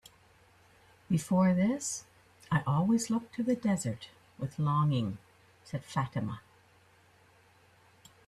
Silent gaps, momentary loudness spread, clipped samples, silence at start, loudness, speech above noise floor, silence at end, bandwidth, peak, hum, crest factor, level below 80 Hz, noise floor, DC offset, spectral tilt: none; 15 LU; under 0.1%; 1.1 s; -31 LUFS; 33 dB; 1.9 s; 13.5 kHz; -16 dBFS; none; 18 dB; -66 dBFS; -63 dBFS; under 0.1%; -6 dB/octave